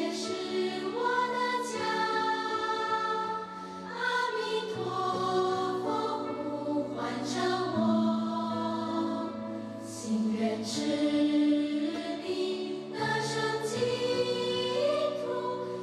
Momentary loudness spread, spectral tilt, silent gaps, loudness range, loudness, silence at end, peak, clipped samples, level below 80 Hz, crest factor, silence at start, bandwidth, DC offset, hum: 7 LU; -4.5 dB/octave; none; 1 LU; -31 LUFS; 0 s; -16 dBFS; under 0.1%; -72 dBFS; 14 dB; 0 s; 12.5 kHz; under 0.1%; none